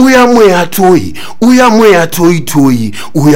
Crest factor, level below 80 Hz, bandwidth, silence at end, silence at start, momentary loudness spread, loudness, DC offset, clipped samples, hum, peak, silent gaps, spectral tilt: 6 dB; -38 dBFS; 17 kHz; 0 s; 0 s; 7 LU; -7 LUFS; 10%; 5%; none; 0 dBFS; none; -5.5 dB/octave